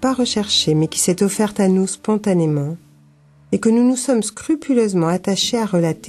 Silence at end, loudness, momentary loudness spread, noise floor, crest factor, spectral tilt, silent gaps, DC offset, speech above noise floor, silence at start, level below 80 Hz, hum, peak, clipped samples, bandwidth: 0 s; -18 LUFS; 6 LU; -50 dBFS; 12 dB; -5 dB/octave; none; under 0.1%; 33 dB; 0 s; -54 dBFS; none; -4 dBFS; under 0.1%; 13 kHz